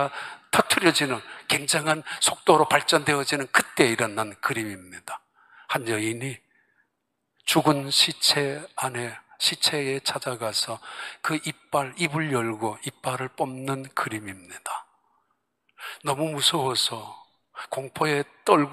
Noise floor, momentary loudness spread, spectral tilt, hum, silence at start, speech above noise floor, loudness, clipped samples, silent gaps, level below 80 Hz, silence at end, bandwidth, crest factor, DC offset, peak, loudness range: -78 dBFS; 16 LU; -3 dB/octave; none; 0 s; 53 dB; -24 LUFS; under 0.1%; none; -70 dBFS; 0 s; 15.5 kHz; 26 dB; under 0.1%; 0 dBFS; 9 LU